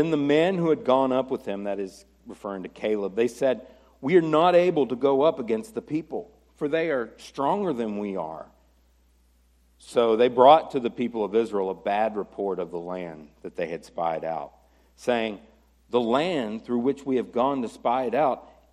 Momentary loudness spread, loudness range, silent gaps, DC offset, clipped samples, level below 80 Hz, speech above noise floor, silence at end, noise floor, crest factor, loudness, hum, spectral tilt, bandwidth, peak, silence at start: 15 LU; 8 LU; none; under 0.1%; under 0.1%; -62 dBFS; 37 dB; 0.3 s; -61 dBFS; 22 dB; -25 LUFS; none; -6.5 dB/octave; 13 kHz; -2 dBFS; 0 s